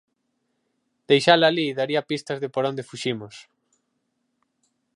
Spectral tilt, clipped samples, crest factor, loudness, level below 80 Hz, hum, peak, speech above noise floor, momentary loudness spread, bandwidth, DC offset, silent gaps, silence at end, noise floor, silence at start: -4.5 dB/octave; under 0.1%; 24 dB; -22 LUFS; -74 dBFS; none; -2 dBFS; 52 dB; 12 LU; 11.5 kHz; under 0.1%; none; 1.55 s; -74 dBFS; 1.1 s